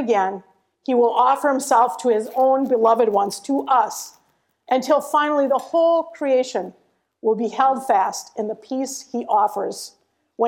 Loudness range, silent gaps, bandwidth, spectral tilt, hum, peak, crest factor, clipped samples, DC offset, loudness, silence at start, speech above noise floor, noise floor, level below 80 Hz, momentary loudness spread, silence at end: 4 LU; none; 17 kHz; -3.5 dB/octave; none; -4 dBFS; 16 dB; under 0.1%; under 0.1%; -20 LUFS; 0 s; 46 dB; -65 dBFS; -74 dBFS; 11 LU; 0 s